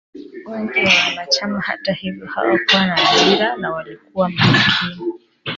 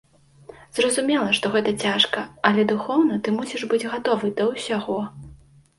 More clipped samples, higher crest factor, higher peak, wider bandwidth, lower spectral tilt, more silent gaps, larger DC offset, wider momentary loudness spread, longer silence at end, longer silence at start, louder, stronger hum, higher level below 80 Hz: neither; about the same, 18 dB vs 22 dB; about the same, 0 dBFS vs -2 dBFS; second, 7.8 kHz vs 11.5 kHz; about the same, -4 dB/octave vs -4 dB/octave; neither; neither; first, 16 LU vs 7 LU; second, 0 s vs 0.45 s; second, 0.15 s vs 0.75 s; first, -16 LUFS vs -22 LUFS; neither; first, -52 dBFS vs -58 dBFS